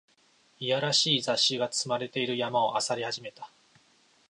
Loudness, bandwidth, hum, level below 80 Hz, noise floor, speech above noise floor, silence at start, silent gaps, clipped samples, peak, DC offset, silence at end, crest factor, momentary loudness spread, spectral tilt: -27 LUFS; 11.5 kHz; none; -80 dBFS; -65 dBFS; 36 dB; 0.6 s; none; under 0.1%; -12 dBFS; under 0.1%; 0.85 s; 18 dB; 14 LU; -2.5 dB/octave